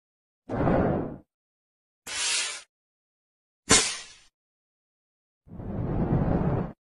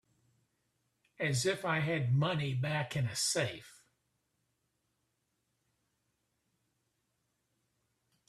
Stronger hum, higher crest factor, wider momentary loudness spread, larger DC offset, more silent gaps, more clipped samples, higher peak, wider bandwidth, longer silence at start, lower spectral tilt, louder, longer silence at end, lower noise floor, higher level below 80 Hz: neither; first, 26 dB vs 20 dB; first, 20 LU vs 5 LU; neither; first, 1.34-2.02 s, 2.69-3.63 s, 4.34-5.41 s vs none; neither; first, -4 dBFS vs -20 dBFS; second, 12.5 kHz vs 14 kHz; second, 0.5 s vs 1.2 s; about the same, -3.5 dB/octave vs -4.5 dB/octave; first, -26 LUFS vs -33 LUFS; second, 0.1 s vs 4.6 s; first, under -90 dBFS vs -82 dBFS; first, -42 dBFS vs -72 dBFS